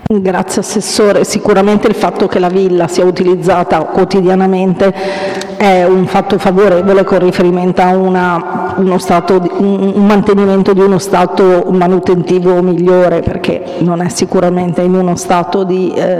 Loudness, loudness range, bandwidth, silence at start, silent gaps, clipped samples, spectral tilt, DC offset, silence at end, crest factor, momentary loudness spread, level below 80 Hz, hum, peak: -10 LUFS; 2 LU; 14 kHz; 0 s; none; under 0.1%; -6 dB/octave; under 0.1%; 0 s; 10 dB; 5 LU; -40 dBFS; none; 0 dBFS